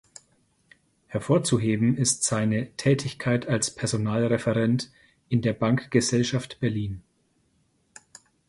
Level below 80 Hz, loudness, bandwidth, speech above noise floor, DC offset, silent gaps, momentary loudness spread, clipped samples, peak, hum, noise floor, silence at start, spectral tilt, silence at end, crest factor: -56 dBFS; -25 LUFS; 11.5 kHz; 44 dB; under 0.1%; none; 6 LU; under 0.1%; -6 dBFS; none; -68 dBFS; 1.1 s; -5 dB/octave; 1.5 s; 20 dB